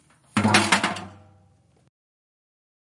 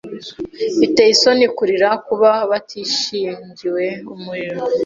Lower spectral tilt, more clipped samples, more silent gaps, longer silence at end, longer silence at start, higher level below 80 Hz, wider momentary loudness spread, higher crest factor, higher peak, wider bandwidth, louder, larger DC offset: about the same, -3.5 dB/octave vs -3 dB/octave; neither; neither; first, 1.85 s vs 0 s; first, 0.35 s vs 0.05 s; second, -66 dBFS vs -60 dBFS; second, 11 LU vs 16 LU; first, 26 dB vs 16 dB; about the same, -2 dBFS vs -2 dBFS; first, 11.5 kHz vs 7.8 kHz; second, -21 LUFS vs -16 LUFS; neither